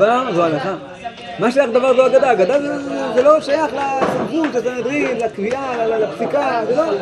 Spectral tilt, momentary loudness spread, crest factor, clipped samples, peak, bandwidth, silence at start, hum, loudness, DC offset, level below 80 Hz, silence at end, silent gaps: -5.5 dB/octave; 9 LU; 16 dB; under 0.1%; 0 dBFS; 11.5 kHz; 0 s; none; -17 LUFS; under 0.1%; -56 dBFS; 0 s; none